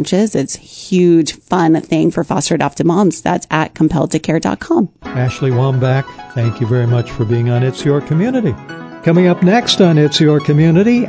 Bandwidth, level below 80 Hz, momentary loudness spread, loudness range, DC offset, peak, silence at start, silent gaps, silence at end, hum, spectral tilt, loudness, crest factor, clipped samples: 8 kHz; -44 dBFS; 8 LU; 3 LU; under 0.1%; 0 dBFS; 0 s; none; 0 s; none; -6.5 dB/octave; -14 LUFS; 14 dB; under 0.1%